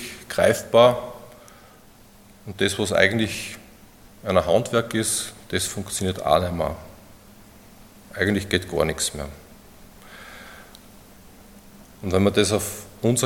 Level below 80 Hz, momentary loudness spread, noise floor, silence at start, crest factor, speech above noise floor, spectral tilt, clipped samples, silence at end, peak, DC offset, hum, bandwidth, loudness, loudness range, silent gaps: -50 dBFS; 22 LU; -50 dBFS; 0 s; 24 dB; 28 dB; -4 dB/octave; under 0.1%; 0 s; 0 dBFS; under 0.1%; none; 17.5 kHz; -22 LUFS; 6 LU; none